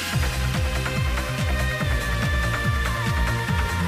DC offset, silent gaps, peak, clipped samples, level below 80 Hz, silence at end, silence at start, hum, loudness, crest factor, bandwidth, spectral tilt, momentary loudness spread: under 0.1%; none; -12 dBFS; under 0.1%; -28 dBFS; 0 s; 0 s; none; -24 LUFS; 12 dB; 16 kHz; -5 dB/octave; 2 LU